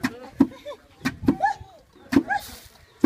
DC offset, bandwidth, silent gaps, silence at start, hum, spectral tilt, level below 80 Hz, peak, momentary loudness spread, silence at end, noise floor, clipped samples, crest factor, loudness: under 0.1%; 16 kHz; none; 0 s; none; -5.5 dB/octave; -50 dBFS; -4 dBFS; 18 LU; 0.45 s; -50 dBFS; under 0.1%; 22 dB; -25 LUFS